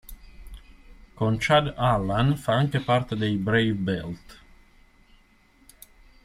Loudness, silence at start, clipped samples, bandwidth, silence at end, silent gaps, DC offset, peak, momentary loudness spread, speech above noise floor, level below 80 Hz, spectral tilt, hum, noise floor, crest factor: -24 LUFS; 0.1 s; under 0.1%; 15 kHz; 1.9 s; none; under 0.1%; -8 dBFS; 8 LU; 35 dB; -46 dBFS; -6.5 dB/octave; none; -58 dBFS; 20 dB